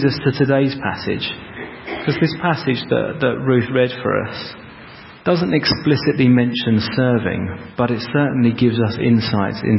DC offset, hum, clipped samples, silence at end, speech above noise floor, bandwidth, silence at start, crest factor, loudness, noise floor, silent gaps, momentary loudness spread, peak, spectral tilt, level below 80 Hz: under 0.1%; none; under 0.1%; 0 s; 22 dB; 5.8 kHz; 0 s; 16 dB; -18 LUFS; -39 dBFS; none; 12 LU; -2 dBFS; -10.5 dB/octave; -44 dBFS